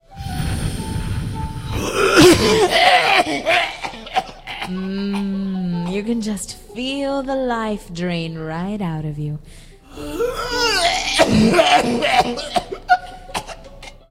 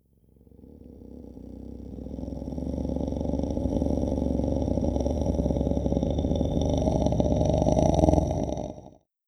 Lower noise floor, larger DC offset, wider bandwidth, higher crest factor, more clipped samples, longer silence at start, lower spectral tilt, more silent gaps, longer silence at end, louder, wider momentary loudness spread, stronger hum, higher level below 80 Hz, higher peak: second, -39 dBFS vs -58 dBFS; neither; first, 16 kHz vs 9.6 kHz; second, 18 dB vs 24 dB; neither; second, 0.1 s vs 0.6 s; second, -4 dB/octave vs -8.5 dB/octave; neither; second, 0.15 s vs 0.35 s; first, -18 LUFS vs -27 LUFS; second, 16 LU vs 19 LU; neither; about the same, -36 dBFS vs -34 dBFS; first, 0 dBFS vs -4 dBFS